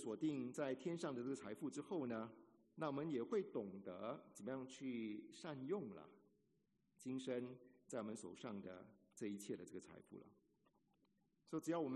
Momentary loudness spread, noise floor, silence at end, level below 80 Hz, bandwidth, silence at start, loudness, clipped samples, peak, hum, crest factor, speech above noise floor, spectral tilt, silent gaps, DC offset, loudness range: 16 LU; -84 dBFS; 0 s; under -90 dBFS; 11.5 kHz; 0 s; -49 LUFS; under 0.1%; -32 dBFS; none; 18 dB; 36 dB; -6 dB/octave; none; under 0.1%; 6 LU